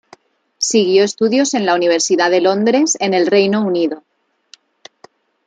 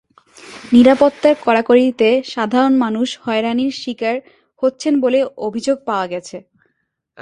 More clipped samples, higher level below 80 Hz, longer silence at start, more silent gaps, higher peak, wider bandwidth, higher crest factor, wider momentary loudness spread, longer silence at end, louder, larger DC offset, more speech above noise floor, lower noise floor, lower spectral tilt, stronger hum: neither; second, -66 dBFS vs -56 dBFS; first, 0.6 s vs 0.45 s; neither; about the same, -2 dBFS vs 0 dBFS; about the same, 9.6 kHz vs 10.5 kHz; about the same, 14 dB vs 16 dB; second, 5 LU vs 11 LU; first, 1.5 s vs 0.85 s; about the same, -14 LUFS vs -16 LUFS; neither; second, 35 dB vs 55 dB; second, -49 dBFS vs -70 dBFS; second, -3.5 dB/octave vs -5 dB/octave; neither